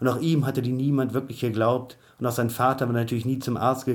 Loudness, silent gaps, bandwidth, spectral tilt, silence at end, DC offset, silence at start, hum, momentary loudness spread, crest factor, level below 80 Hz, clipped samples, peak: -25 LUFS; none; 19 kHz; -7 dB/octave; 0 s; under 0.1%; 0 s; none; 6 LU; 16 dB; -62 dBFS; under 0.1%; -8 dBFS